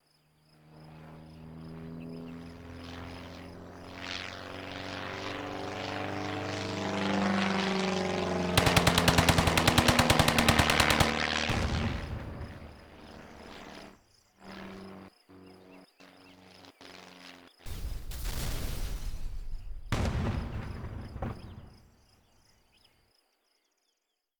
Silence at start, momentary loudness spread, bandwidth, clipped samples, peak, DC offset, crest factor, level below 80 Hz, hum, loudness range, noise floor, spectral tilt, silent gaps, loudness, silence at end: 0.7 s; 25 LU; over 20 kHz; under 0.1%; -6 dBFS; under 0.1%; 26 dB; -42 dBFS; none; 24 LU; -81 dBFS; -4 dB/octave; none; -29 LUFS; 2.65 s